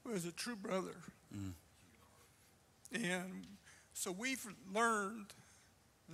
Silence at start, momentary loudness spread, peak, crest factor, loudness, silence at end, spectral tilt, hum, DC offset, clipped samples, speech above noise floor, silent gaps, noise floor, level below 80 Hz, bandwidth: 0.05 s; 21 LU; -24 dBFS; 20 dB; -42 LUFS; 0 s; -3.5 dB/octave; none; under 0.1%; under 0.1%; 27 dB; none; -69 dBFS; -76 dBFS; 15.5 kHz